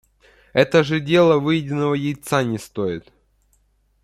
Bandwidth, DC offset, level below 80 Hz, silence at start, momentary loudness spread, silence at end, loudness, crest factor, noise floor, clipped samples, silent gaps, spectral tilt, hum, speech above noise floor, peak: 14.5 kHz; under 0.1%; -56 dBFS; 0.55 s; 10 LU; 1.05 s; -19 LUFS; 20 dB; -62 dBFS; under 0.1%; none; -6 dB/octave; none; 43 dB; 0 dBFS